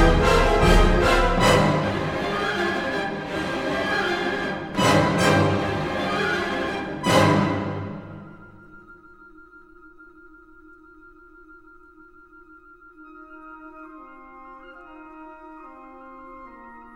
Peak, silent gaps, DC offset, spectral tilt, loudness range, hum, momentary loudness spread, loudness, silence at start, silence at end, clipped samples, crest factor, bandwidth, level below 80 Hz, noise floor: -2 dBFS; none; under 0.1%; -5 dB/octave; 23 LU; none; 26 LU; -21 LUFS; 0 s; 0.1 s; under 0.1%; 20 dB; 16 kHz; -32 dBFS; -50 dBFS